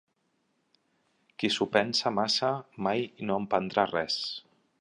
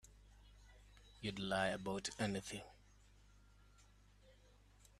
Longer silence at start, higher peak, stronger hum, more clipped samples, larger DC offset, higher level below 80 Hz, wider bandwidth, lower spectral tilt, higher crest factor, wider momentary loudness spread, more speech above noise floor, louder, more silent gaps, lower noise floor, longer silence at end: first, 1.4 s vs 0.05 s; first, -6 dBFS vs -24 dBFS; second, none vs 50 Hz at -65 dBFS; neither; neither; about the same, -70 dBFS vs -66 dBFS; second, 11 kHz vs 13.5 kHz; about the same, -4 dB/octave vs -4 dB/octave; about the same, 24 dB vs 24 dB; second, 7 LU vs 26 LU; first, 46 dB vs 25 dB; first, -29 LUFS vs -43 LUFS; neither; first, -75 dBFS vs -67 dBFS; first, 0.4 s vs 0.1 s